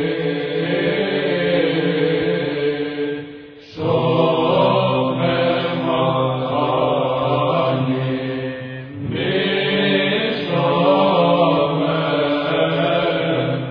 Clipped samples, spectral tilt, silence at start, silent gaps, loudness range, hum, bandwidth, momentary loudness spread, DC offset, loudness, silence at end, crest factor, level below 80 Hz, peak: under 0.1%; -9 dB/octave; 0 s; none; 3 LU; none; 5.4 kHz; 9 LU; under 0.1%; -18 LUFS; 0 s; 16 dB; -54 dBFS; -2 dBFS